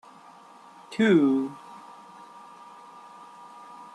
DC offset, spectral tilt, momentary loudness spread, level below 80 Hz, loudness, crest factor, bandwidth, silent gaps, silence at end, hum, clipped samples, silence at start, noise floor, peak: under 0.1%; -7 dB/octave; 26 LU; -76 dBFS; -24 LUFS; 20 dB; 11 kHz; none; 0.1 s; none; under 0.1%; 0.9 s; -50 dBFS; -10 dBFS